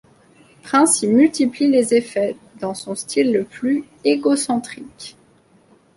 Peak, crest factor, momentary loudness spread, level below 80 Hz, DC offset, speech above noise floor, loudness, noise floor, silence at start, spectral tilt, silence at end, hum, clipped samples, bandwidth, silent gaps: -2 dBFS; 18 dB; 16 LU; -64 dBFS; under 0.1%; 36 dB; -18 LUFS; -54 dBFS; 0.65 s; -3.5 dB/octave; 0.85 s; none; under 0.1%; 11.5 kHz; none